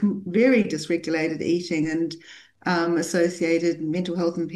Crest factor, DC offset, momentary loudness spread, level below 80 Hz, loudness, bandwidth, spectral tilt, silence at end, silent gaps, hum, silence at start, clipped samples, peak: 16 dB; under 0.1%; 7 LU; -66 dBFS; -23 LUFS; 12.5 kHz; -5.5 dB/octave; 0 s; none; none; 0 s; under 0.1%; -8 dBFS